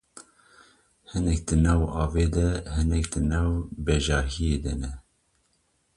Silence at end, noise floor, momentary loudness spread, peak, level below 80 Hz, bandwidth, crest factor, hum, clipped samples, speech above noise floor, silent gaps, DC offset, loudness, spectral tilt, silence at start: 0.95 s; -70 dBFS; 9 LU; -10 dBFS; -30 dBFS; 11.5 kHz; 16 dB; none; under 0.1%; 45 dB; none; under 0.1%; -26 LUFS; -6 dB/octave; 0.15 s